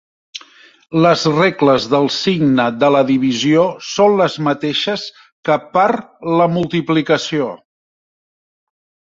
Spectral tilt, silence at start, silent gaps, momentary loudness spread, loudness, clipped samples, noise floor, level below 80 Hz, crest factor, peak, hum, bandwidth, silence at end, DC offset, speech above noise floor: -5.5 dB/octave; 0.35 s; 5.32-5.43 s; 11 LU; -15 LUFS; under 0.1%; -45 dBFS; -56 dBFS; 16 dB; 0 dBFS; none; 7.8 kHz; 1.6 s; under 0.1%; 31 dB